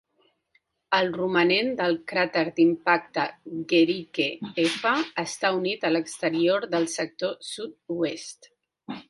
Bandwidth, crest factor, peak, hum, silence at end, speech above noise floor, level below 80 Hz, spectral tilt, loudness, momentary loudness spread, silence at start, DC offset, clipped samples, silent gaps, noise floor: 11.5 kHz; 20 dB; -6 dBFS; none; 0.1 s; 44 dB; -70 dBFS; -4 dB/octave; -25 LUFS; 10 LU; 0.9 s; under 0.1%; under 0.1%; none; -69 dBFS